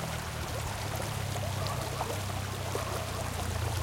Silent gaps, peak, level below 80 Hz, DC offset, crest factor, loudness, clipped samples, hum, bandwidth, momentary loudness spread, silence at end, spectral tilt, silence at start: none; -18 dBFS; -46 dBFS; under 0.1%; 16 dB; -34 LUFS; under 0.1%; none; 17 kHz; 2 LU; 0 s; -4 dB/octave; 0 s